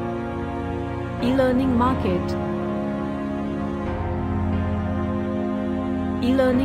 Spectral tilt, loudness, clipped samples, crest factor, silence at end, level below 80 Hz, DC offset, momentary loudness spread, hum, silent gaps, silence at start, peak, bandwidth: -8.5 dB/octave; -24 LUFS; under 0.1%; 14 dB; 0 s; -38 dBFS; under 0.1%; 8 LU; none; none; 0 s; -8 dBFS; 13 kHz